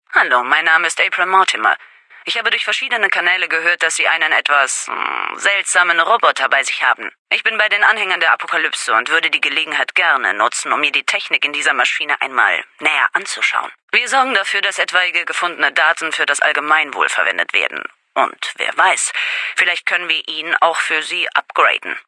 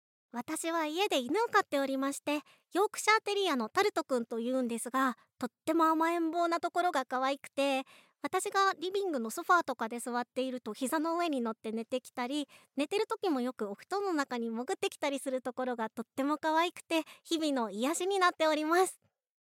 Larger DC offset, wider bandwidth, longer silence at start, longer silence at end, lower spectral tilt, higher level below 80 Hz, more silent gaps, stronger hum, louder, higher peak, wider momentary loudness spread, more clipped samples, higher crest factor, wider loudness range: neither; second, 12 kHz vs 16.5 kHz; second, 0.1 s vs 0.35 s; second, 0.05 s vs 0.55 s; second, 1 dB/octave vs -2.5 dB/octave; first, -80 dBFS vs under -90 dBFS; first, 7.19-7.25 s, 13.83-13.88 s vs none; neither; first, -15 LUFS vs -32 LUFS; first, 0 dBFS vs -14 dBFS; second, 5 LU vs 9 LU; neither; about the same, 16 dB vs 18 dB; about the same, 2 LU vs 4 LU